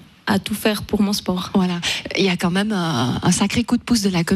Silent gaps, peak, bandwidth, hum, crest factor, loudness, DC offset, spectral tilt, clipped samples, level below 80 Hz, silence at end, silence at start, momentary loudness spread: none; -4 dBFS; 15 kHz; none; 14 dB; -20 LUFS; under 0.1%; -4.5 dB/octave; under 0.1%; -44 dBFS; 0 s; 0.25 s; 3 LU